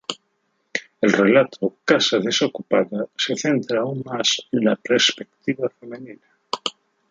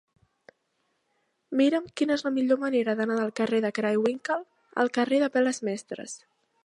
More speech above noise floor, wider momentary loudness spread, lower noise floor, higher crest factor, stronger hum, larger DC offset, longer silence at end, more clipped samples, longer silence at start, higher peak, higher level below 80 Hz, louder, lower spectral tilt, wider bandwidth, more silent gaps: about the same, 49 dB vs 49 dB; about the same, 12 LU vs 11 LU; second, -70 dBFS vs -75 dBFS; about the same, 20 dB vs 18 dB; neither; neither; about the same, 0.4 s vs 0.5 s; neither; second, 0.1 s vs 1.5 s; first, -2 dBFS vs -10 dBFS; first, -70 dBFS vs -76 dBFS; first, -21 LUFS vs -26 LUFS; about the same, -3.5 dB/octave vs -4.5 dB/octave; second, 9.2 kHz vs 11 kHz; neither